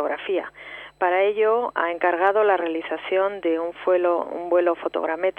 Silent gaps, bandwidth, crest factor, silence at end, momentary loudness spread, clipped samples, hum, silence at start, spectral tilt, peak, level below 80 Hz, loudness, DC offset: none; 4.3 kHz; 16 dB; 0.1 s; 8 LU; under 0.1%; none; 0 s; -6 dB/octave; -6 dBFS; -66 dBFS; -22 LUFS; under 0.1%